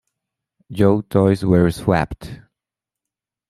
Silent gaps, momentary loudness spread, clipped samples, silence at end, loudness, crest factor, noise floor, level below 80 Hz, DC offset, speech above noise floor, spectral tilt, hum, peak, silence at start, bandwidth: none; 18 LU; under 0.1%; 1.15 s; -17 LUFS; 18 dB; -87 dBFS; -44 dBFS; under 0.1%; 70 dB; -8 dB/octave; none; -2 dBFS; 0.7 s; 14 kHz